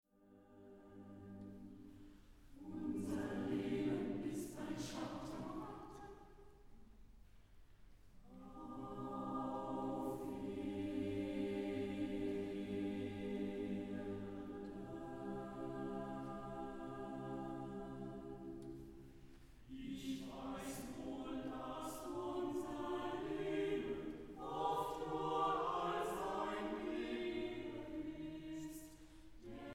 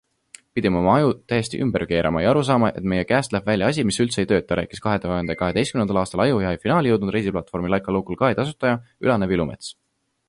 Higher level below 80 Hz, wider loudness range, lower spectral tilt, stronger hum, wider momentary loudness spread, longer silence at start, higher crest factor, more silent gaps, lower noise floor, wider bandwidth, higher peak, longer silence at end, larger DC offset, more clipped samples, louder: second, -64 dBFS vs -44 dBFS; first, 9 LU vs 2 LU; about the same, -6 dB/octave vs -6 dB/octave; neither; first, 17 LU vs 6 LU; second, 0.2 s vs 0.55 s; about the same, 18 dB vs 18 dB; neither; first, -67 dBFS vs -50 dBFS; first, 17 kHz vs 11.5 kHz; second, -26 dBFS vs -4 dBFS; second, 0 s vs 0.55 s; neither; neither; second, -45 LUFS vs -21 LUFS